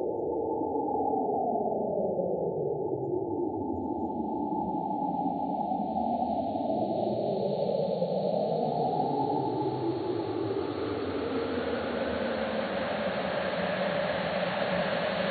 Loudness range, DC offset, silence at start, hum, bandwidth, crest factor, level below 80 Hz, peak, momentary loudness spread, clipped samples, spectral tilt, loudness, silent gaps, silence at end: 2 LU; under 0.1%; 0 s; none; 4.7 kHz; 14 dB; -62 dBFS; -16 dBFS; 3 LU; under 0.1%; -10 dB/octave; -30 LUFS; none; 0 s